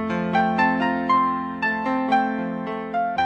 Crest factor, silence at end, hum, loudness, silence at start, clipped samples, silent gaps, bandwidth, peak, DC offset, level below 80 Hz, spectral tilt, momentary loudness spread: 16 dB; 0 s; none; -22 LUFS; 0 s; under 0.1%; none; 8.6 kHz; -6 dBFS; under 0.1%; -60 dBFS; -7 dB/octave; 7 LU